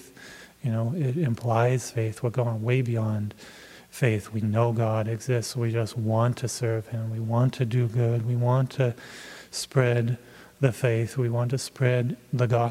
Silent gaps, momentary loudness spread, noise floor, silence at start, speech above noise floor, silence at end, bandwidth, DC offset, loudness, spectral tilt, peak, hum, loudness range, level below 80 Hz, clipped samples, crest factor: none; 11 LU; -47 dBFS; 0.05 s; 22 dB; 0 s; 14.5 kHz; under 0.1%; -26 LUFS; -6.5 dB/octave; -6 dBFS; none; 1 LU; -64 dBFS; under 0.1%; 18 dB